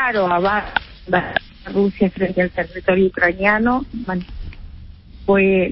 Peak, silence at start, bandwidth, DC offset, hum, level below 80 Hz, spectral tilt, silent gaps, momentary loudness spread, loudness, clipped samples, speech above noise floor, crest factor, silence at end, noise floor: -2 dBFS; 0 s; 5.8 kHz; under 0.1%; none; -38 dBFS; -11.5 dB/octave; none; 11 LU; -18 LUFS; under 0.1%; 21 dB; 18 dB; 0 s; -38 dBFS